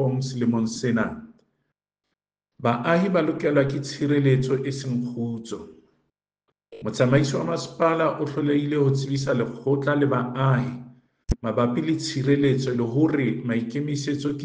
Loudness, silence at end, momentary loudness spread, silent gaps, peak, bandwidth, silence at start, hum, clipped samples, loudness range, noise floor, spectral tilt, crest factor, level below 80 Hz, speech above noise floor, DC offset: -24 LUFS; 0 s; 9 LU; none; -4 dBFS; 9.4 kHz; 0 s; none; under 0.1%; 3 LU; -82 dBFS; -7 dB/octave; 20 dB; -48 dBFS; 59 dB; under 0.1%